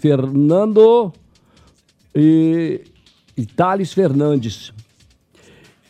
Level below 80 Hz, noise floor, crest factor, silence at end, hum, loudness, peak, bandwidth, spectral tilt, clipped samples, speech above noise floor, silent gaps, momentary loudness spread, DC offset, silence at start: -58 dBFS; -55 dBFS; 14 dB; 1.1 s; none; -15 LUFS; -2 dBFS; 9.2 kHz; -8 dB/octave; under 0.1%; 40 dB; none; 17 LU; under 0.1%; 0.05 s